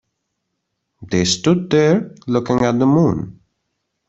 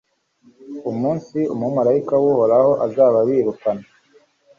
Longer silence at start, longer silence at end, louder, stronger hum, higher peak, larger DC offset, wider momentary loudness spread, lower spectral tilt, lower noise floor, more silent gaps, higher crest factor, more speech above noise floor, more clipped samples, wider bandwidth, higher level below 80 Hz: first, 1 s vs 0.6 s; about the same, 0.8 s vs 0.75 s; about the same, -17 LUFS vs -18 LUFS; neither; about the same, -2 dBFS vs -4 dBFS; neither; second, 8 LU vs 12 LU; second, -5.5 dB/octave vs -9.5 dB/octave; first, -74 dBFS vs -56 dBFS; neither; about the same, 16 dB vs 14 dB; first, 59 dB vs 39 dB; neither; first, 8.2 kHz vs 7 kHz; first, -50 dBFS vs -62 dBFS